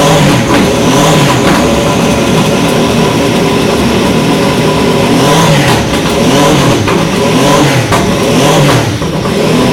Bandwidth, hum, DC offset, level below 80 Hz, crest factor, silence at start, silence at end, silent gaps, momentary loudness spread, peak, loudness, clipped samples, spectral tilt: 17 kHz; none; under 0.1%; -28 dBFS; 8 dB; 0 s; 0 s; none; 3 LU; 0 dBFS; -8 LUFS; under 0.1%; -5 dB/octave